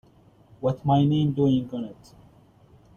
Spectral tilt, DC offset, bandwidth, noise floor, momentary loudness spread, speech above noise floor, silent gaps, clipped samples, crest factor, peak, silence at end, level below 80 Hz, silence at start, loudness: -9.5 dB/octave; under 0.1%; 6.8 kHz; -55 dBFS; 14 LU; 32 dB; none; under 0.1%; 16 dB; -10 dBFS; 1.05 s; -56 dBFS; 0.6 s; -24 LUFS